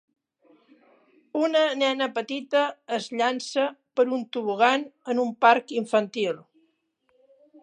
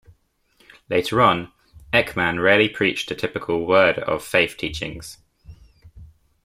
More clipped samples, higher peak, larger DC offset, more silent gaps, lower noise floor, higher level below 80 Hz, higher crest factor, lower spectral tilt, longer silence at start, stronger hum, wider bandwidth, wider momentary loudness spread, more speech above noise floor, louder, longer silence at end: neither; about the same, -4 dBFS vs -2 dBFS; neither; neither; first, -71 dBFS vs -61 dBFS; second, -84 dBFS vs -50 dBFS; about the same, 22 dB vs 20 dB; about the same, -3.5 dB/octave vs -4.5 dB/octave; first, 1.35 s vs 0.9 s; neither; second, 10.5 kHz vs 16 kHz; second, 9 LU vs 13 LU; first, 47 dB vs 41 dB; second, -25 LUFS vs -20 LUFS; first, 1.2 s vs 0.4 s